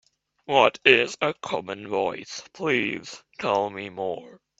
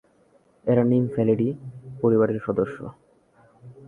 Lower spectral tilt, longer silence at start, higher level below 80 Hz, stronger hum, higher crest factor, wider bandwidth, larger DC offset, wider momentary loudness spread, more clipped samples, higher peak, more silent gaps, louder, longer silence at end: second, -3.5 dB/octave vs -11 dB/octave; second, 0.5 s vs 0.65 s; second, -68 dBFS vs -60 dBFS; neither; first, 24 dB vs 18 dB; first, 8 kHz vs 3.5 kHz; neither; about the same, 17 LU vs 18 LU; neither; first, 0 dBFS vs -6 dBFS; neither; about the same, -24 LUFS vs -23 LUFS; first, 0.25 s vs 0 s